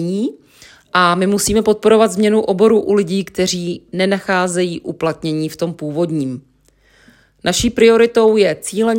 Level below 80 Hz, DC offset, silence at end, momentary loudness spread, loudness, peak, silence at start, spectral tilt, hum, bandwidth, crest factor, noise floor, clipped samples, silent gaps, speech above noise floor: -44 dBFS; under 0.1%; 0 s; 10 LU; -15 LUFS; 0 dBFS; 0 s; -4.5 dB/octave; none; 16.5 kHz; 16 dB; -54 dBFS; under 0.1%; none; 39 dB